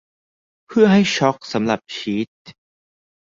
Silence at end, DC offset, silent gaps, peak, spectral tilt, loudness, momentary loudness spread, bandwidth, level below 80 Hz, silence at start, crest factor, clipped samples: 0.7 s; under 0.1%; 2.28-2.45 s; -2 dBFS; -5.5 dB/octave; -18 LUFS; 11 LU; 7.6 kHz; -60 dBFS; 0.7 s; 18 dB; under 0.1%